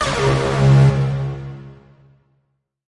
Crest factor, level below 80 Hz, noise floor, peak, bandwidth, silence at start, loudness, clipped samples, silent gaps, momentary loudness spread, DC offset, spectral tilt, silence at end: 14 dB; -36 dBFS; -68 dBFS; -4 dBFS; 11 kHz; 0 s; -16 LUFS; under 0.1%; none; 20 LU; under 0.1%; -6.5 dB/octave; 1.15 s